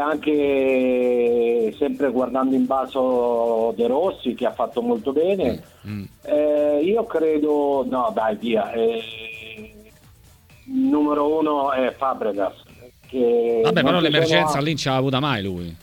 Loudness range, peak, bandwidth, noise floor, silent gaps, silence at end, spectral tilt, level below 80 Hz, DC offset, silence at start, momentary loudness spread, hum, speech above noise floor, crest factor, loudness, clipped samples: 4 LU; -4 dBFS; 16.5 kHz; -50 dBFS; none; 0.05 s; -6 dB/octave; -54 dBFS; under 0.1%; 0 s; 10 LU; none; 30 dB; 18 dB; -21 LUFS; under 0.1%